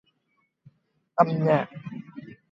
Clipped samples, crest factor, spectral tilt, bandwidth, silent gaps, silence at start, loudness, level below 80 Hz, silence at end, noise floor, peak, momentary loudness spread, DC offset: under 0.1%; 24 dB; -9 dB/octave; 7.2 kHz; none; 1.15 s; -24 LUFS; -72 dBFS; 0.2 s; -73 dBFS; -4 dBFS; 21 LU; under 0.1%